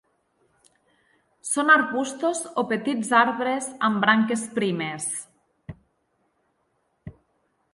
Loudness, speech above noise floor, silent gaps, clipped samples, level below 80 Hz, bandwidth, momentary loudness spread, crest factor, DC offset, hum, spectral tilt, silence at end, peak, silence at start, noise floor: -23 LUFS; 48 dB; none; under 0.1%; -64 dBFS; 11.5 kHz; 15 LU; 22 dB; under 0.1%; none; -3.5 dB/octave; 0.65 s; -4 dBFS; 1.45 s; -71 dBFS